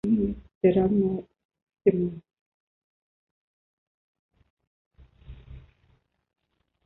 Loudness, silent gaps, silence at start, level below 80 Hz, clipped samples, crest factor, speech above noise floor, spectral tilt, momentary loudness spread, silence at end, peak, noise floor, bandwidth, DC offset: -25 LUFS; 0.55-0.61 s, 1.45-1.49 s, 1.62-1.67 s, 2.41-4.29 s, 4.50-4.57 s, 4.67-4.91 s; 0.05 s; -52 dBFS; under 0.1%; 22 dB; 44 dB; -11 dB/octave; 23 LU; 1.25 s; -8 dBFS; -67 dBFS; 4 kHz; under 0.1%